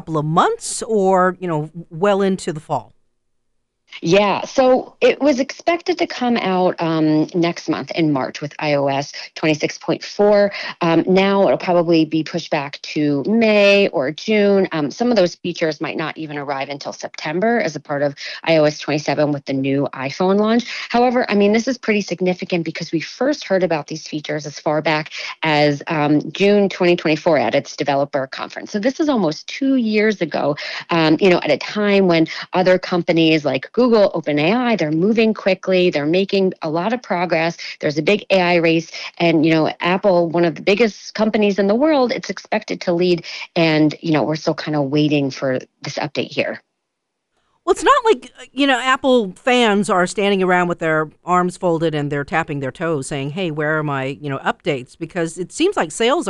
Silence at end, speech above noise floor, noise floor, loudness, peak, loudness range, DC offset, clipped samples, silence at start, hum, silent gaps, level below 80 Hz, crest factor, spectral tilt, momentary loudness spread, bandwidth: 0 s; 59 dB; -76 dBFS; -18 LUFS; -2 dBFS; 4 LU; under 0.1%; under 0.1%; 0.05 s; none; none; -56 dBFS; 16 dB; -5.5 dB/octave; 9 LU; 11 kHz